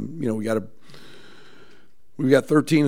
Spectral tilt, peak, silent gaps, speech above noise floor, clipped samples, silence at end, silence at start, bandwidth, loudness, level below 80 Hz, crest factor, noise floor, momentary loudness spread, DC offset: -6.5 dB/octave; -2 dBFS; none; 37 dB; under 0.1%; 0 s; 0 s; 16 kHz; -22 LUFS; -66 dBFS; 22 dB; -57 dBFS; 10 LU; 1%